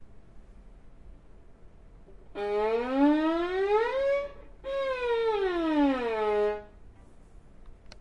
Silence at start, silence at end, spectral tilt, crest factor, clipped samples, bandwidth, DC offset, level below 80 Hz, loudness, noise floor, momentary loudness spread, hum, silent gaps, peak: 0 s; 0 s; -6 dB/octave; 16 dB; under 0.1%; 10.5 kHz; under 0.1%; -52 dBFS; -28 LUFS; -51 dBFS; 12 LU; none; none; -14 dBFS